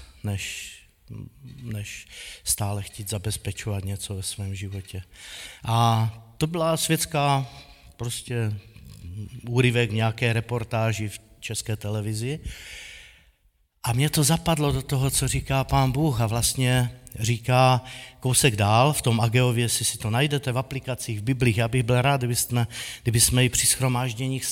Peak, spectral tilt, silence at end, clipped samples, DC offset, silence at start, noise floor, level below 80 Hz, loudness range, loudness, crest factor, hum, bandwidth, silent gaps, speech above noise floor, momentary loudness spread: -4 dBFS; -4.5 dB/octave; 0 s; under 0.1%; under 0.1%; 0 s; -65 dBFS; -44 dBFS; 9 LU; -24 LUFS; 22 dB; none; 17 kHz; none; 41 dB; 18 LU